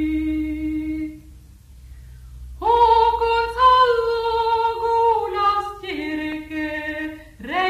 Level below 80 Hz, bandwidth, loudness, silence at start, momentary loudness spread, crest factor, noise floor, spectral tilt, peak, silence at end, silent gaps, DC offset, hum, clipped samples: -40 dBFS; 15 kHz; -20 LUFS; 0 s; 14 LU; 16 dB; -44 dBFS; -5.5 dB/octave; -4 dBFS; 0 s; none; under 0.1%; none; under 0.1%